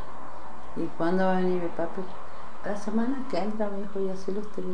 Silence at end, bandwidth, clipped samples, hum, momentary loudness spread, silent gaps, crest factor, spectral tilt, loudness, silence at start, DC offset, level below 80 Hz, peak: 0 s; 10 kHz; under 0.1%; none; 17 LU; none; 18 dB; -7.5 dB/octave; -30 LUFS; 0 s; 6%; -60 dBFS; -14 dBFS